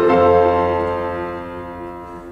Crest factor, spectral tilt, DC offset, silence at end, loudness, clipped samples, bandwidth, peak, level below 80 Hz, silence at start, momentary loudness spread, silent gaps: 16 dB; -8 dB/octave; under 0.1%; 0 s; -17 LUFS; under 0.1%; 6.8 kHz; -2 dBFS; -42 dBFS; 0 s; 19 LU; none